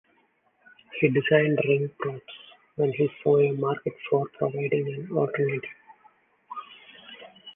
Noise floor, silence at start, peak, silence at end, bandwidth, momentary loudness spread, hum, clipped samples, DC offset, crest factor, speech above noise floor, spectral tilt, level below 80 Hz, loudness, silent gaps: -67 dBFS; 0.9 s; -6 dBFS; 0 s; 3.7 kHz; 23 LU; none; under 0.1%; under 0.1%; 20 dB; 42 dB; -10 dB/octave; -70 dBFS; -25 LUFS; none